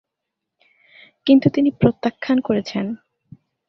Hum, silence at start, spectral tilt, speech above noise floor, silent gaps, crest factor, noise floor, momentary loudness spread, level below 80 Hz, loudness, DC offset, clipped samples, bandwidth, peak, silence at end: none; 1.25 s; -8 dB/octave; 64 dB; none; 18 dB; -81 dBFS; 12 LU; -54 dBFS; -19 LUFS; under 0.1%; under 0.1%; 6.2 kHz; -2 dBFS; 0.75 s